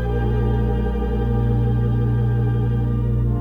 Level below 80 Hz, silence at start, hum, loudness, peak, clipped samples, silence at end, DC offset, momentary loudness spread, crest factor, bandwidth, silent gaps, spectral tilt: -24 dBFS; 0 s; 60 Hz at -45 dBFS; -21 LUFS; -8 dBFS; under 0.1%; 0 s; under 0.1%; 2 LU; 10 dB; 3.8 kHz; none; -10.5 dB/octave